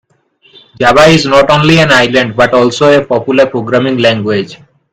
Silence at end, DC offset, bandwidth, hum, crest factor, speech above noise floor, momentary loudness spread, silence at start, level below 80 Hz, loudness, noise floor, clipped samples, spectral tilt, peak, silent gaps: 0.35 s; under 0.1%; 15 kHz; none; 8 dB; 42 dB; 7 LU; 0.8 s; -38 dBFS; -8 LUFS; -50 dBFS; 2%; -5 dB/octave; 0 dBFS; none